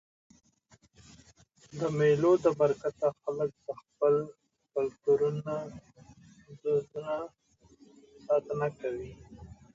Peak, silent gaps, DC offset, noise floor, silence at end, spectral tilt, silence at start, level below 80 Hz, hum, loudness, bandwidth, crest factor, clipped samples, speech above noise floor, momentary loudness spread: -12 dBFS; none; under 0.1%; -64 dBFS; 0.2 s; -7.5 dB/octave; 1.75 s; -64 dBFS; none; -30 LUFS; 7.8 kHz; 20 dB; under 0.1%; 35 dB; 20 LU